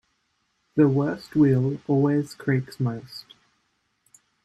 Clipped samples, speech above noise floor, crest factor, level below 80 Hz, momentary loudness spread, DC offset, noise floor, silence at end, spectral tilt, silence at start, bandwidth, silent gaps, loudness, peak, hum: under 0.1%; 49 dB; 18 dB; -60 dBFS; 12 LU; under 0.1%; -72 dBFS; 1.25 s; -8.5 dB/octave; 0.75 s; 12.5 kHz; none; -23 LUFS; -6 dBFS; none